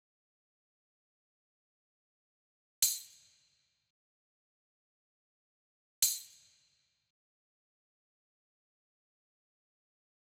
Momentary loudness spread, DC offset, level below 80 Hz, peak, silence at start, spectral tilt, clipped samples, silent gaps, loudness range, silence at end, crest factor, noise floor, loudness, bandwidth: 10 LU; under 0.1%; -88 dBFS; -12 dBFS; 2.8 s; 3.5 dB/octave; under 0.1%; 3.90-6.02 s; 0 LU; 3.95 s; 32 dB; -76 dBFS; -32 LUFS; 17.5 kHz